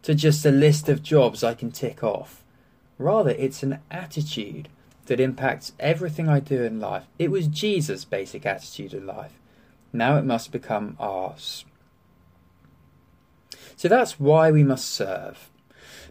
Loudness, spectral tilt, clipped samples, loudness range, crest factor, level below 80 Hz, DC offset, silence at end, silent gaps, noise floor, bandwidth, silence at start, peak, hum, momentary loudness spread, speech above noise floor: -23 LUFS; -6 dB/octave; under 0.1%; 6 LU; 18 dB; -62 dBFS; under 0.1%; 0.05 s; none; -59 dBFS; 16 kHz; 0.05 s; -6 dBFS; none; 17 LU; 36 dB